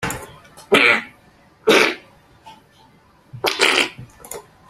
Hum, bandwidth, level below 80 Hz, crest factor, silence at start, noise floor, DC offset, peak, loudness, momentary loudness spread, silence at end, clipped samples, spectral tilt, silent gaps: none; 16 kHz; -54 dBFS; 22 dB; 0 s; -52 dBFS; under 0.1%; 0 dBFS; -16 LUFS; 22 LU; 0.3 s; under 0.1%; -2.5 dB/octave; none